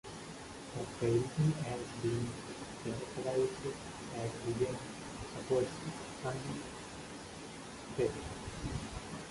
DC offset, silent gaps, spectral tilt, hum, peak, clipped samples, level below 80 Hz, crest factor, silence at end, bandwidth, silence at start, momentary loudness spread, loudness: under 0.1%; none; -5.5 dB/octave; none; -20 dBFS; under 0.1%; -56 dBFS; 18 dB; 0 s; 11.5 kHz; 0.05 s; 13 LU; -39 LUFS